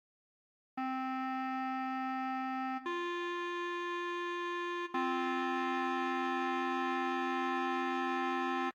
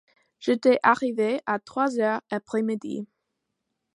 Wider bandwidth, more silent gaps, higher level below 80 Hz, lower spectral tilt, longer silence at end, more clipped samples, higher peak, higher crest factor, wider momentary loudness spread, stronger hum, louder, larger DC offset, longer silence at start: first, 16.5 kHz vs 11.5 kHz; neither; second, under -90 dBFS vs -74 dBFS; second, -3 dB/octave vs -5.5 dB/octave; second, 0.05 s vs 0.9 s; neither; second, -22 dBFS vs -4 dBFS; second, 14 dB vs 22 dB; second, 3 LU vs 12 LU; neither; second, -36 LUFS vs -25 LUFS; neither; first, 0.75 s vs 0.4 s